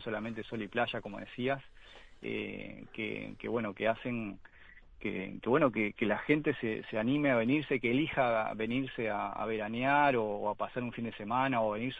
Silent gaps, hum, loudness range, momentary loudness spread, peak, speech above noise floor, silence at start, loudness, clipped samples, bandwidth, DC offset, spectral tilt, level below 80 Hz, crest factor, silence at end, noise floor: none; none; 7 LU; 11 LU; -14 dBFS; 22 dB; 0 s; -33 LUFS; under 0.1%; 6.6 kHz; under 0.1%; -8 dB/octave; -60 dBFS; 20 dB; 0 s; -55 dBFS